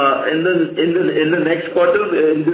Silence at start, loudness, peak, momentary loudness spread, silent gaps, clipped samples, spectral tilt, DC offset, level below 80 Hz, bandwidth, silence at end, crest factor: 0 s; -16 LUFS; -4 dBFS; 2 LU; none; under 0.1%; -10 dB/octave; under 0.1%; -60 dBFS; 4 kHz; 0 s; 12 dB